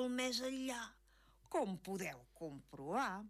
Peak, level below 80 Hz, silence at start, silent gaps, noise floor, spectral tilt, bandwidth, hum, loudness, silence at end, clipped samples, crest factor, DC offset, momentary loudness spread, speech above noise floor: -28 dBFS; -72 dBFS; 0 s; none; -69 dBFS; -3.5 dB/octave; 15.5 kHz; none; -43 LUFS; 0 s; under 0.1%; 14 dB; under 0.1%; 13 LU; 26 dB